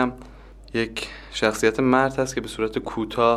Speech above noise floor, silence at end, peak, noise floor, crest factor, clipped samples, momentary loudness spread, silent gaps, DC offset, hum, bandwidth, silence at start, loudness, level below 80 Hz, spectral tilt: 21 dB; 0 s; -4 dBFS; -44 dBFS; 20 dB; under 0.1%; 11 LU; none; under 0.1%; none; 14.5 kHz; 0 s; -24 LUFS; -46 dBFS; -4.5 dB/octave